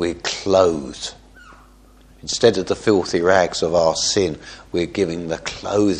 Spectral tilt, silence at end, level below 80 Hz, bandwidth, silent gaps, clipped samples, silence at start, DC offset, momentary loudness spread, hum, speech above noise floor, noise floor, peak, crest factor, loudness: -4 dB/octave; 0 s; -46 dBFS; 10.5 kHz; none; under 0.1%; 0 s; under 0.1%; 11 LU; none; 29 dB; -48 dBFS; 0 dBFS; 20 dB; -19 LUFS